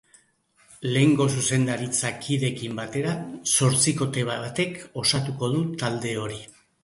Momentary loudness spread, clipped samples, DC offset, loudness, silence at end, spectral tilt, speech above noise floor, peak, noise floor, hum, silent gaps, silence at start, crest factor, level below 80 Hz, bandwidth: 10 LU; under 0.1%; under 0.1%; -24 LUFS; 0.4 s; -4 dB/octave; 38 dB; -8 dBFS; -62 dBFS; none; none; 0.7 s; 18 dB; -60 dBFS; 11.5 kHz